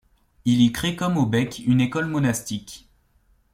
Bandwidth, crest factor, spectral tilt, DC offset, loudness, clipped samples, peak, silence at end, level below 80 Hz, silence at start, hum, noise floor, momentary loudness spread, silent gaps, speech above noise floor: 16.5 kHz; 16 dB; -5.5 dB/octave; under 0.1%; -22 LUFS; under 0.1%; -6 dBFS; 0.75 s; -52 dBFS; 0.45 s; none; -61 dBFS; 13 LU; none; 40 dB